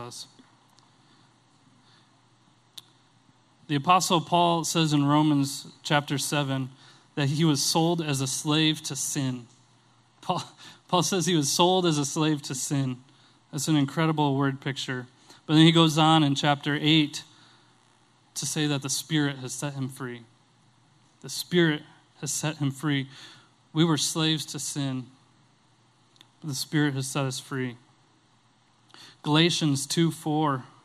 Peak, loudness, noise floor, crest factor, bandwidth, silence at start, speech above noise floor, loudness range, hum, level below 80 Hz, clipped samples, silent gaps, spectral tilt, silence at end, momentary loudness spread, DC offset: -4 dBFS; -25 LUFS; -63 dBFS; 22 dB; 15 kHz; 0 s; 38 dB; 8 LU; none; -68 dBFS; under 0.1%; none; -4.5 dB/octave; 0.2 s; 15 LU; under 0.1%